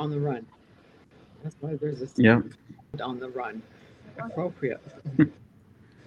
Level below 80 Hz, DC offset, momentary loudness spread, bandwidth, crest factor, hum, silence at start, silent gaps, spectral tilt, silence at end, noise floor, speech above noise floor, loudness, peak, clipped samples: -64 dBFS; under 0.1%; 21 LU; 8 kHz; 26 dB; none; 0 s; none; -8.5 dB/octave; 0.75 s; -56 dBFS; 29 dB; -28 LUFS; -4 dBFS; under 0.1%